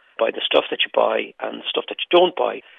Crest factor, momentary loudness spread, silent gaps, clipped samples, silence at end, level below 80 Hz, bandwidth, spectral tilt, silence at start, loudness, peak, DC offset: 18 dB; 8 LU; none; under 0.1%; 0.2 s; -74 dBFS; 4.4 kHz; -6 dB/octave; 0.2 s; -20 LUFS; -2 dBFS; under 0.1%